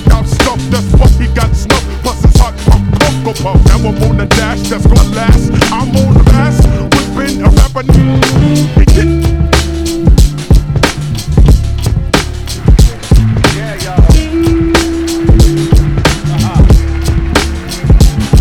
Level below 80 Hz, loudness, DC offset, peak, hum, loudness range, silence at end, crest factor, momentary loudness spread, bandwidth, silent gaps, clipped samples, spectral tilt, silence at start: -10 dBFS; -10 LUFS; under 0.1%; 0 dBFS; none; 2 LU; 0 s; 8 dB; 5 LU; 16 kHz; none; 4%; -6 dB/octave; 0 s